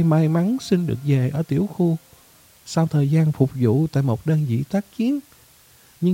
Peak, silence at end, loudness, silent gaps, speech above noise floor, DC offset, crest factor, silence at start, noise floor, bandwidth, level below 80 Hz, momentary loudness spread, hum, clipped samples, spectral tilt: -4 dBFS; 0 s; -21 LUFS; none; 33 dB; under 0.1%; 16 dB; 0 s; -52 dBFS; 16 kHz; -56 dBFS; 6 LU; none; under 0.1%; -8 dB/octave